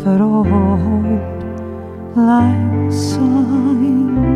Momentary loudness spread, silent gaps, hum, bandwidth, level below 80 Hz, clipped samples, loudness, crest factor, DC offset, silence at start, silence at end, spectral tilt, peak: 12 LU; none; none; 11.5 kHz; -34 dBFS; under 0.1%; -15 LUFS; 12 dB; under 0.1%; 0 s; 0 s; -8 dB/octave; -2 dBFS